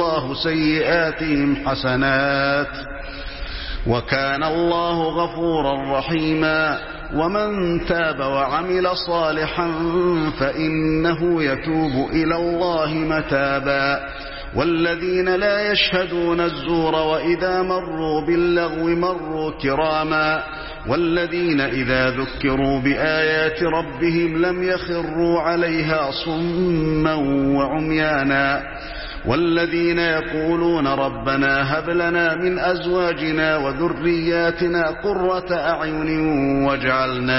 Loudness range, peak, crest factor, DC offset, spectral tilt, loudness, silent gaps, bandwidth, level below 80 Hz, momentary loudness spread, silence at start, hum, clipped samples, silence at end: 1 LU; -4 dBFS; 16 dB; 0.2%; -9.5 dB/octave; -20 LUFS; none; 5.8 kHz; -38 dBFS; 5 LU; 0 s; none; under 0.1%; 0 s